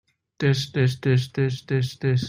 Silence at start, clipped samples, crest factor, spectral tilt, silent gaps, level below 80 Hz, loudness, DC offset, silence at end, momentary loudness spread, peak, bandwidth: 0.4 s; under 0.1%; 16 dB; -6.5 dB/octave; none; -58 dBFS; -24 LUFS; under 0.1%; 0 s; 4 LU; -8 dBFS; 11.5 kHz